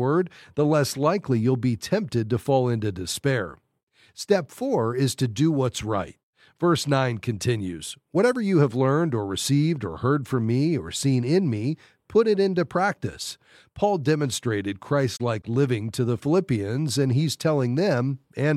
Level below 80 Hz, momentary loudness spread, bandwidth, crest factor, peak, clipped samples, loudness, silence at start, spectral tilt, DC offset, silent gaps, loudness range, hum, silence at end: -58 dBFS; 7 LU; 15 kHz; 16 dB; -6 dBFS; under 0.1%; -24 LUFS; 0 s; -6 dB/octave; under 0.1%; 3.83-3.87 s, 6.23-6.33 s; 2 LU; none; 0 s